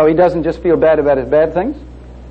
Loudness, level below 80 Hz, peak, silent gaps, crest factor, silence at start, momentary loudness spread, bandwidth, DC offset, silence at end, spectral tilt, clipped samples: -13 LUFS; -34 dBFS; -2 dBFS; none; 12 dB; 0 s; 9 LU; 6.2 kHz; under 0.1%; 0 s; -9 dB/octave; under 0.1%